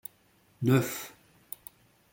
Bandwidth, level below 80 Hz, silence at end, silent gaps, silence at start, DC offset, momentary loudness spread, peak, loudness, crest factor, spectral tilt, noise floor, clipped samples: 17 kHz; -68 dBFS; 1.05 s; none; 0.6 s; under 0.1%; 20 LU; -12 dBFS; -29 LUFS; 22 dB; -6 dB/octave; -65 dBFS; under 0.1%